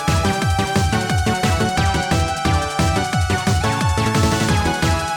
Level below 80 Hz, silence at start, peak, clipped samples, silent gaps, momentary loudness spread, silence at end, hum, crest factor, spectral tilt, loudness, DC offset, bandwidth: -28 dBFS; 0 s; -6 dBFS; under 0.1%; none; 2 LU; 0 s; none; 12 dB; -5 dB/octave; -18 LUFS; under 0.1%; 18.5 kHz